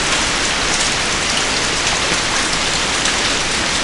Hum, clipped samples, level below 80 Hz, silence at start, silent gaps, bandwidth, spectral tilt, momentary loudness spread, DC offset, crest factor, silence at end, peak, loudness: none; under 0.1%; -32 dBFS; 0 s; none; 11.5 kHz; -1 dB/octave; 1 LU; under 0.1%; 16 dB; 0 s; 0 dBFS; -15 LUFS